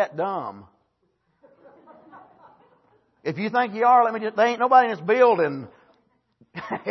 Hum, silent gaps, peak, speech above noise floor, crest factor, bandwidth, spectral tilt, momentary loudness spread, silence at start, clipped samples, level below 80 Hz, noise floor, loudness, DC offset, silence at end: none; none; -4 dBFS; 49 dB; 20 dB; 6.2 kHz; -6 dB/octave; 17 LU; 0 s; under 0.1%; -74 dBFS; -70 dBFS; -21 LUFS; under 0.1%; 0 s